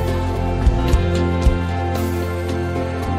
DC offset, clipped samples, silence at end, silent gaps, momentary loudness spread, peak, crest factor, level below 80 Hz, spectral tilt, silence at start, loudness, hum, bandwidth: under 0.1%; under 0.1%; 0 s; none; 5 LU; -4 dBFS; 14 dB; -22 dBFS; -7 dB/octave; 0 s; -20 LUFS; none; 16 kHz